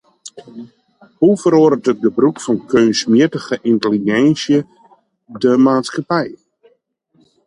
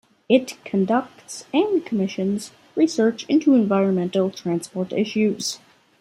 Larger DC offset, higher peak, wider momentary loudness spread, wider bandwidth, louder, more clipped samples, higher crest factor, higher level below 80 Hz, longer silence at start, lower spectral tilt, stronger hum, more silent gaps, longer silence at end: neither; first, 0 dBFS vs -4 dBFS; first, 20 LU vs 10 LU; second, 11 kHz vs 14.5 kHz; first, -15 LUFS vs -22 LUFS; neither; about the same, 16 dB vs 18 dB; first, -60 dBFS vs -68 dBFS; about the same, 0.25 s vs 0.3 s; about the same, -5.5 dB/octave vs -5.5 dB/octave; neither; neither; first, 1.1 s vs 0.45 s